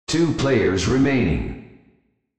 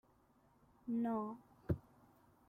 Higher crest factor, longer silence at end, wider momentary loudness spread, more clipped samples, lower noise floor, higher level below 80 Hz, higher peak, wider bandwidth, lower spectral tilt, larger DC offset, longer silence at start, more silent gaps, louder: second, 14 dB vs 20 dB; about the same, 0.65 s vs 0.7 s; second, 11 LU vs 14 LU; neither; second, -62 dBFS vs -72 dBFS; first, -36 dBFS vs -64 dBFS; first, -8 dBFS vs -24 dBFS; second, 8.8 kHz vs 14.5 kHz; second, -6 dB/octave vs -10.5 dB/octave; neither; second, 0.1 s vs 0.85 s; neither; first, -20 LUFS vs -42 LUFS